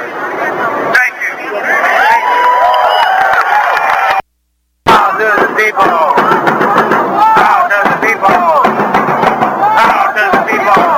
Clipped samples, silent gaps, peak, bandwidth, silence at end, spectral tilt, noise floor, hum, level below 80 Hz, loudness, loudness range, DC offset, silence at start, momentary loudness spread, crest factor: under 0.1%; none; 0 dBFS; 17 kHz; 0 s; -4 dB/octave; -61 dBFS; none; -48 dBFS; -9 LUFS; 1 LU; under 0.1%; 0 s; 6 LU; 10 dB